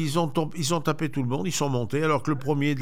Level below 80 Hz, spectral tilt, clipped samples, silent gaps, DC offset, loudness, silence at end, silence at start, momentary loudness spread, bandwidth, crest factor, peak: -58 dBFS; -5.5 dB/octave; under 0.1%; none; 2%; -26 LUFS; 0 s; 0 s; 3 LU; 16.5 kHz; 14 dB; -10 dBFS